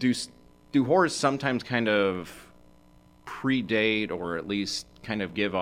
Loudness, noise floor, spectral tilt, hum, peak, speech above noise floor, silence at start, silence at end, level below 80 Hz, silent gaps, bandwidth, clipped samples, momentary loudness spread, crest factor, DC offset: -27 LUFS; -56 dBFS; -4.5 dB/octave; none; -8 dBFS; 30 dB; 0 s; 0 s; -60 dBFS; none; 15.5 kHz; under 0.1%; 11 LU; 20 dB; under 0.1%